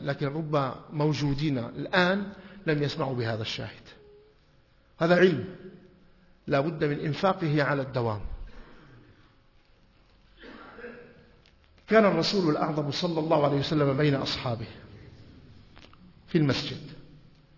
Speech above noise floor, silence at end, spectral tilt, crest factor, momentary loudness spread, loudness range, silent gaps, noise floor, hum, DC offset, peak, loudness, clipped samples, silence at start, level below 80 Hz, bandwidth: 34 dB; 0.4 s; -6.5 dB/octave; 22 dB; 21 LU; 7 LU; none; -61 dBFS; none; under 0.1%; -6 dBFS; -27 LUFS; under 0.1%; 0 s; -52 dBFS; 6 kHz